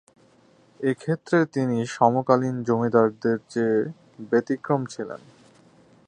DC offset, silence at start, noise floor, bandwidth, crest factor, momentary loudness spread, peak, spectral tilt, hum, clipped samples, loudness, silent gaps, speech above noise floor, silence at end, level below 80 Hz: under 0.1%; 0.8 s; -57 dBFS; 10 kHz; 20 dB; 12 LU; -4 dBFS; -7.5 dB/octave; none; under 0.1%; -24 LUFS; none; 34 dB; 0.9 s; -68 dBFS